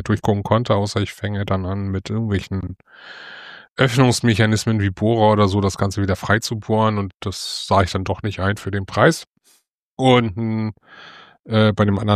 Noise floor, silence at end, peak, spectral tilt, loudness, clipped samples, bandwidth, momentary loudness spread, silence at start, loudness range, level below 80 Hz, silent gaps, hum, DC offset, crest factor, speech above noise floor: -60 dBFS; 0 s; -2 dBFS; -6 dB/octave; -19 LUFS; under 0.1%; 14 kHz; 13 LU; 0 s; 4 LU; -46 dBFS; 3.70-3.76 s, 7.14-7.20 s, 9.27-9.32 s, 9.71-9.97 s; none; under 0.1%; 18 dB; 41 dB